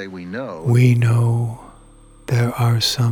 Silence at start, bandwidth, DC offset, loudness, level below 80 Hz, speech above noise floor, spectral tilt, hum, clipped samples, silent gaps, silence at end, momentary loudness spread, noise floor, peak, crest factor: 0 s; 16 kHz; under 0.1%; -18 LUFS; -48 dBFS; 28 dB; -6 dB/octave; none; under 0.1%; none; 0 s; 15 LU; -45 dBFS; -2 dBFS; 16 dB